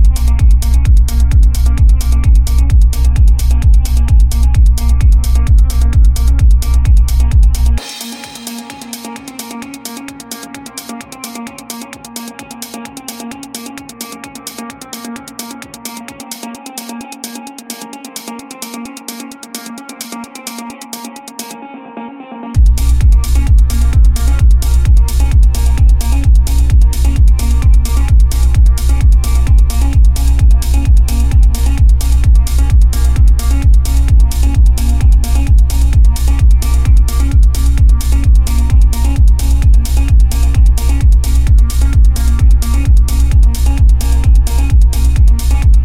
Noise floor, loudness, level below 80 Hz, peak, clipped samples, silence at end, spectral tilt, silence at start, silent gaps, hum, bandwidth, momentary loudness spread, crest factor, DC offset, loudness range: -29 dBFS; -11 LUFS; -10 dBFS; 0 dBFS; under 0.1%; 0 s; -5.5 dB/octave; 0 s; none; none; 15.5 kHz; 15 LU; 8 dB; under 0.1%; 15 LU